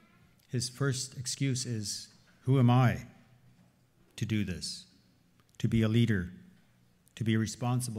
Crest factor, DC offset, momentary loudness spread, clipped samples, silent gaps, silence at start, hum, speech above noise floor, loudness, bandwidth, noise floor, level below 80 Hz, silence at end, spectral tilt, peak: 18 dB; under 0.1%; 14 LU; under 0.1%; none; 0.55 s; 60 Hz at -50 dBFS; 36 dB; -31 LUFS; 15 kHz; -66 dBFS; -58 dBFS; 0 s; -5.5 dB/octave; -14 dBFS